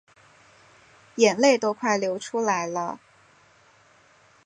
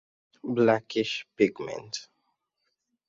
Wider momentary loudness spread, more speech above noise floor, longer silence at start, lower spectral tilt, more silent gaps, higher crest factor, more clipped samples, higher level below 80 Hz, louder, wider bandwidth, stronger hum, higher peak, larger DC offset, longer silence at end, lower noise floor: about the same, 15 LU vs 14 LU; second, 35 dB vs 52 dB; first, 1.15 s vs 0.45 s; second, -3.5 dB/octave vs -5 dB/octave; neither; about the same, 22 dB vs 22 dB; neither; second, -76 dBFS vs -70 dBFS; first, -23 LUFS vs -28 LUFS; first, 11 kHz vs 7.8 kHz; neither; first, -4 dBFS vs -8 dBFS; neither; first, 1.5 s vs 1.05 s; second, -58 dBFS vs -79 dBFS